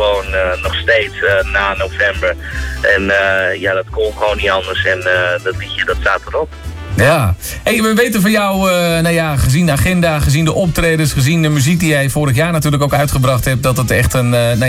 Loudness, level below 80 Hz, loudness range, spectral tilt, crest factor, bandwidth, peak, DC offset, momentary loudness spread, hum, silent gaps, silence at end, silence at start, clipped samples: -13 LUFS; -28 dBFS; 2 LU; -5 dB/octave; 12 dB; 16.5 kHz; -2 dBFS; under 0.1%; 6 LU; none; none; 0 s; 0 s; under 0.1%